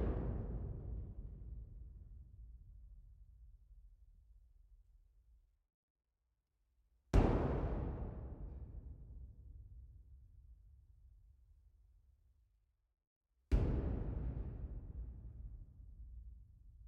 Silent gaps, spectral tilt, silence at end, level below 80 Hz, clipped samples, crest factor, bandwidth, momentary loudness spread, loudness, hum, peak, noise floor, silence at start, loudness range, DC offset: 5.74-5.95 s, 13.07-13.21 s; -8.5 dB/octave; 0 s; -46 dBFS; under 0.1%; 26 dB; 7.2 kHz; 26 LU; -43 LUFS; none; -18 dBFS; -86 dBFS; 0 s; 21 LU; under 0.1%